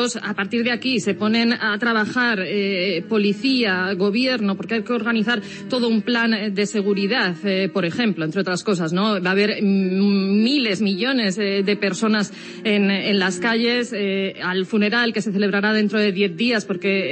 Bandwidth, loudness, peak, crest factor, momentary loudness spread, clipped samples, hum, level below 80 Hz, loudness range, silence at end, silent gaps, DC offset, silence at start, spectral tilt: 8.8 kHz; -20 LUFS; -6 dBFS; 14 dB; 4 LU; under 0.1%; none; -72 dBFS; 1 LU; 0 s; none; under 0.1%; 0 s; -5 dB/octave